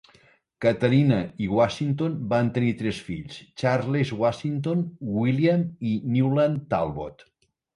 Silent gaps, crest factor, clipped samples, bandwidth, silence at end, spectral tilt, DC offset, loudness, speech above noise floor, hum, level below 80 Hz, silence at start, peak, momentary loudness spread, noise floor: none; 18 dB; under 0.1%; 11 kHz; 0.6 s; -8 dB/octave; under 0.1%; -24 LUFS; 35 dB; none; -54 dBFS; 0.6 s; -8 dBFS; 9 LU; -59 dBFS